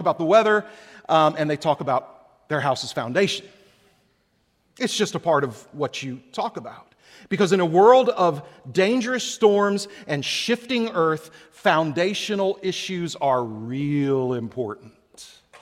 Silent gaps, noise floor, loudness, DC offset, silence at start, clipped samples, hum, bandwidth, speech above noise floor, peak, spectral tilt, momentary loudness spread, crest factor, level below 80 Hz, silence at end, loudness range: none; -67 dBFS; -22 LUFS; under 0.1%; 0 s; under 0.1%; none; 15 kHz; 45 dB; -2 dBFS; -5 dB/octave; 13 LU; 20 dB; -68 dBFS; 0.35 s; 7 LU